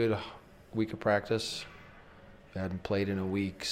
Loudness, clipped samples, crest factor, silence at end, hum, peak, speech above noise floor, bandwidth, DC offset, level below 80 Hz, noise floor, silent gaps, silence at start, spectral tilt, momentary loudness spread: -33 LUFS; under 0.1%; 20 dB; 0 s; none; -14 dBFS; 22 dB; 15.5 kHz; under 0.1%; -60 dBFS; -54 dBFS; none; 0 s; -5.5 dB/octave; 18 LU